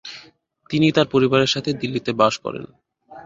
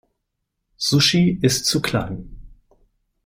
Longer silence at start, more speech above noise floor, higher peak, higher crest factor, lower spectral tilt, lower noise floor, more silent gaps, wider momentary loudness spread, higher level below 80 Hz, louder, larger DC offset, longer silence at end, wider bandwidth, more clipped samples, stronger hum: second, 0.05 s vs 0.8 s; second, 33 dB vs 58 dB; about the same, -4 dBFS vs -4 dBFS; about the same, 18 dB vs 18 dB; first, -5.5 dB/octave vs -4 dB/octave; second, -52 dBFS vs -77 dBFS; neither; first, 17 LU vs 12 LU; second, -58 dBFS vs -46 dBFS; about the same, -19 LUFS vs -18 LUFS; neither; second, 0.05 s vs 0.7 s; second, 7.8 kHz vs 16 kHz; neither; neither